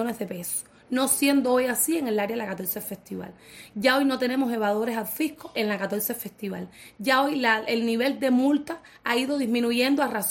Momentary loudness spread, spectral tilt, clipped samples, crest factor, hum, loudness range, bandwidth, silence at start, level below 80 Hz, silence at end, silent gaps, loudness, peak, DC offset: 13 LU; -3 dB/octave; under 0.1%; 18 dB; none; 3 LU; 17 kHz; 0 s; -66 dBFS; 0 s; none; -25 LUFS; -6 dBFS; under 0.1%